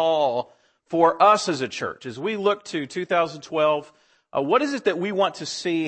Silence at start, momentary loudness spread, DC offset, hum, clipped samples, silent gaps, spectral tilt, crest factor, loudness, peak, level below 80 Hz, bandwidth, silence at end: 0 s; 12 LU; under 0.1%; none; under 0.1%; none; -4.5 dB/octave; 18 dB; -23 LUFS; -4 dBFS; -70 dBFS; 8.8 kHz; 0 s